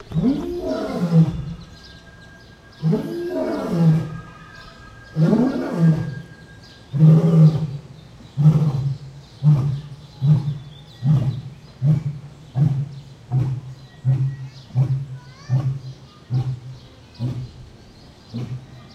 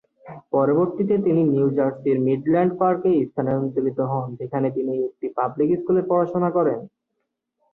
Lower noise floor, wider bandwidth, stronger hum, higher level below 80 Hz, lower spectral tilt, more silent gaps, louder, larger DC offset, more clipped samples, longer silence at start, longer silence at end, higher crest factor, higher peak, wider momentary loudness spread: second, -45 dBFS vs -78 dBFS; first, 6.6 kHz vs 4 kHz; neither; first, -46 dBFS vs -62 dBFS; second, -9.5 dB/octave vs -12 dB/octave; neither; about the same, -20 LUFS vs -22 LUFS; neither; neither; second, 0 s vs 0.25 s; second, 0 s vs 0.85 s; about the same, 18 dB vs 14 dB; first, -4 dBFS vs -8 dBFS; first, 23 LU vs 7 LU